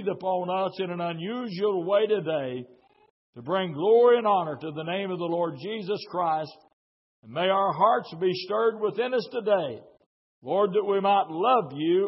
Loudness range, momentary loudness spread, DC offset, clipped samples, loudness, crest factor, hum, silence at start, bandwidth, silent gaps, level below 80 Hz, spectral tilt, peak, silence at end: 4 LU; 11 LU; under 0.1%; under 0.1%; -26 LUFS; 18 dB; none; 0 s; 5.8 kHz; 3.10-3.33 s, 6.73-7.23 s, 10.06-10.42 s; -78 dBFS; -9.5 dB/octave; -8 dBFS; 0 s